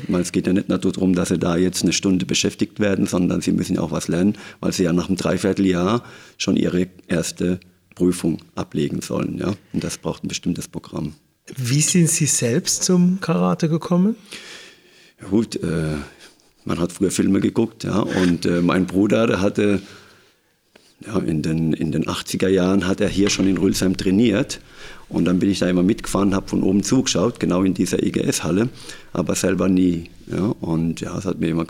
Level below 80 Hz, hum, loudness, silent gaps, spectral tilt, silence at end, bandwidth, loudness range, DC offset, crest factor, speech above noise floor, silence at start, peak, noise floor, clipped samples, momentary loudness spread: -48 dBFS; none; -20 LUFS; none; -5 dB/octave; 0 s; 16 kHz; 5 LU; under 0.1%; 16 dB; 40 dB; 0 s; -4 dBFS; -60 dBFS; under 0.1%; 10 LU